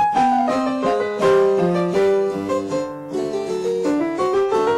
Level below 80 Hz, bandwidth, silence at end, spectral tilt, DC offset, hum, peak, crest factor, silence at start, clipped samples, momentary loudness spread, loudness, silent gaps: -54 dBFS; 12 kHz; 0 s; -6 dB/octave; under 0.1%; none; -8 dBFS; 12 dB; 0 s; under 0.1%; 8 LU; -19 LUFS; none